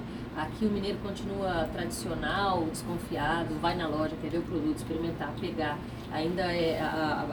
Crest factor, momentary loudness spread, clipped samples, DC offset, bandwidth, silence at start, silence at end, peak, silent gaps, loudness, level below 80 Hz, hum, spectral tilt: 18 dB; 6 LU; under 0.1%; under 0.1%; over 20 kHz; 0 s; 0 s; -14 dBFS; none; -32 LUFS; -48 dBFS; none; -5.5 dB/octave